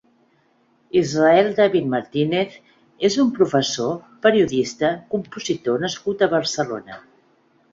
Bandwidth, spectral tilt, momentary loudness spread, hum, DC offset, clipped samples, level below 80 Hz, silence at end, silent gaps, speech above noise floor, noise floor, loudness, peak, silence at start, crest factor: 7.8 kHz; -5 dB/octave; 11 LU; none; under 0.1%; under 0.1%; -60 dBFS; 0.75 s; none; 41 dB; -61 dBFS; -20 LUFS; -2 dBFS; 0.95 s; 18 dB